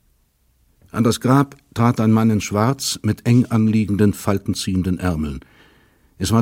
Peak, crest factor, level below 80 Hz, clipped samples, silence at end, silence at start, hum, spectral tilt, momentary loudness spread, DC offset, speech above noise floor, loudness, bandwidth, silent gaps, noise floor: 0 dBFS; 18 dB; -42 dBFS; under 0.1%; 0 s; 0.95 s; none; -6 dB/octave; 9 LU; under 0.1%; 43 dB; -19 LUFS; 16.5 kHz; none; -61 dBFS